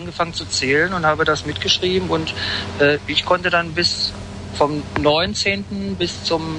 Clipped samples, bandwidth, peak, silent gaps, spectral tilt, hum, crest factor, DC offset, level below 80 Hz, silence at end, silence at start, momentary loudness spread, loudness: under 0.1%; 10.5 kHz; -4 dBFS; none; -4 dB/octave; none; 16 dB; under 0.1%; -44 dBFS; 0 s; 0 s; 7 LU; -19 LUFS